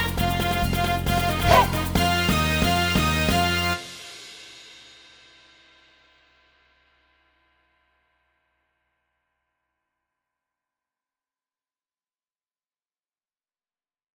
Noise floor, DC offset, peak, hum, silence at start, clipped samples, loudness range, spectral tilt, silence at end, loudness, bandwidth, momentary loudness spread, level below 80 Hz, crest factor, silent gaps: under -90 dBFS; under 0.1%; -4 dBFS; none; 0 s; under 0.1%; 14 LU; -4.5 dB/octave; 9.5 s; -21 LUFS; over 20 kHz; 22 LU; -38 dBFS; 24 dB; none